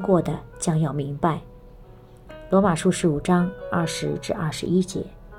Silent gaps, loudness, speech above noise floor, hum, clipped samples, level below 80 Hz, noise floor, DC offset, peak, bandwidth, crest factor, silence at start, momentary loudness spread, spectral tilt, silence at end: none; -24 LUFS; 23 dB; none; under 0.1%; -46 dBFS; -46 dBFS; under 0.1%; -8 dBFS; 13.5 kHz; 16 dB; 0 s; 8 LU; -6 dB/octave; 0 s